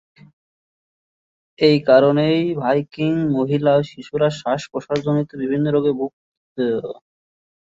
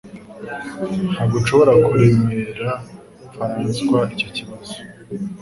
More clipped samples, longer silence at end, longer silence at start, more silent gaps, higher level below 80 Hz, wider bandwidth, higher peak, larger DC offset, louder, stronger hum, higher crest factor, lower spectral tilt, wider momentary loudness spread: neither; first, 0.75 s vs 0 s; first, 1.6 s vs 0.05 s; first, 6.13-6.56 s vs none; second, -60 dBFS vs -46 dBFS; second, 7.8 kHz vs 11.5 kHz; about the same, -2 dBFS vs 0 dBFS; neither; about the same, -19 LUFS vs -18 LUFS; neither; about the same, 18 dB vs 18 dB; about the same, -7.5 dB/octave vs -7 dB/octave; second, 13 LU vs 20 LU